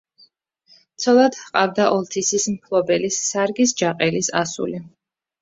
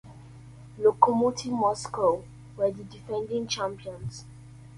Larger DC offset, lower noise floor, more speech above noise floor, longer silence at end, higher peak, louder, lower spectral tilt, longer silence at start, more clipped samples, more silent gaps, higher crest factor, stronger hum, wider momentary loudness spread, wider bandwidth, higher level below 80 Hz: neither; first, -57 dBFS vs -47 dBFS; first, 38 dB vs 20 dB; first, 0.55 s vs 0 s; about the same, -2 dBFS vs -2 dBFS; first, -19 LUFS vs -27 LUFS; second, -3.5 dB/octave vs -5 dB/octave; first, 1 s vs 0.05 s; neither; neither; second, 18 dB vs 26 dB; neither; second, 9 LU vs 24 LU; second, 8 kHz vs 11.5 kHz; second, -62 dBFS vs -56 dBFS